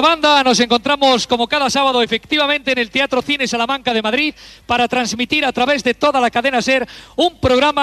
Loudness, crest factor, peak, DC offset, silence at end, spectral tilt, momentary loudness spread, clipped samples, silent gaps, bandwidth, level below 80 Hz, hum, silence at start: -15 LUFS; 16 dB; 0 dBFS; under 0.1%; 0 s; -3 dB/octave; 5 LU; under 0.1%; none; 13.5 kHz; -46 dBFS; none; 0 s